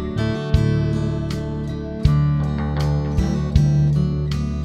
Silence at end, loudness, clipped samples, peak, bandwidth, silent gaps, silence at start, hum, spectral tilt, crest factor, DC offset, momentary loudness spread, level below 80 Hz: 0 s; -20 LUFS; under 0.1%; -2 dBFS; 8.4 kHz; none; 0 s; none; -8 dB/octave; 18 dB; under 0.1%; 8 LU; -26 dBFS